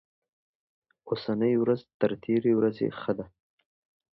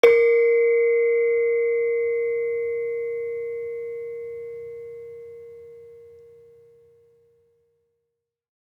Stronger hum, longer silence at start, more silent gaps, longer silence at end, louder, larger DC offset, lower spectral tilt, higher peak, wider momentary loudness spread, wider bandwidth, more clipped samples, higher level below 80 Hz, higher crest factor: neither; first, 1.05 s vs 0.05 s; first, 1.94-2.00 s vs none; second, 0.9 s vs 2.55 s; second, -28 LUFS vs -22 LUFS; neither; first, -10 dB/octave vs -3.5 dB/octave; second, -10 dBFS vs -2 dBFS; second, 10 LU vs 22 LU; about the same, 5.8 kHz vs 6.2 kHz; neither; about the same, -68 dBFS vs -72 dBFS; about the same, 20 dB vs 22 dB